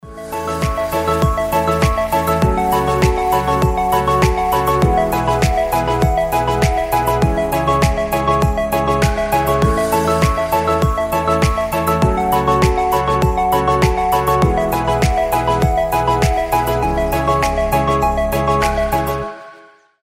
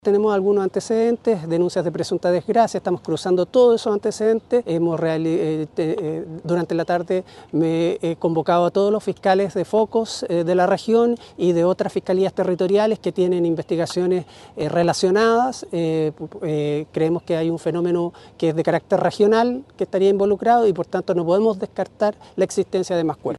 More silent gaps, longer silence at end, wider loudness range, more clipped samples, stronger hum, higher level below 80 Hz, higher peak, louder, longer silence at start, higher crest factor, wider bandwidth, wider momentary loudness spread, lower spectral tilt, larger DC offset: neither; first, 0.5 s vs 0 s; about the same, 1 LU vs 3 LU; neither; neither; first, -24 dBFS vs -60 dBFS; first, 0 dBFS vs -4 dBFS; first, -16 LUFS vs -20 LUFS; about the same, 0.05 s vs 0.05 s; about the same, 16 dB vs 16 dB; first, 16.5 kHz vs 12 kHz; second, 3 LU vs 7 LU; about the same, -6 dB/octave vs -6.5 dB/octave; neither